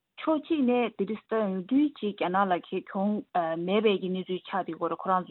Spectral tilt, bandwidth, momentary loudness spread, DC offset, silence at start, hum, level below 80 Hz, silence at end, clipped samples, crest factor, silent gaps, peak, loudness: -10 dB/octave; 4.3 kHz; 7 LU; under 0.1%; 0.2 s; none; -76 dBFS; 0.05 s; under 0.1%; 16 dB; none; -12 dBFS; -29 LUFS